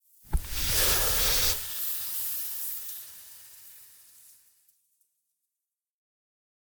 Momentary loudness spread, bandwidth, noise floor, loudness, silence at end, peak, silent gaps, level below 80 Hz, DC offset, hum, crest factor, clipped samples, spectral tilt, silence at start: 24 LU; over 20 kHz; -89 dBFS; -26 LUFS; 2.9 s; -12 dBFS; none; -42 dBFS; under 0.1%; none; 20 dB; under 0.1%; -1 dB/octave; 0.25 s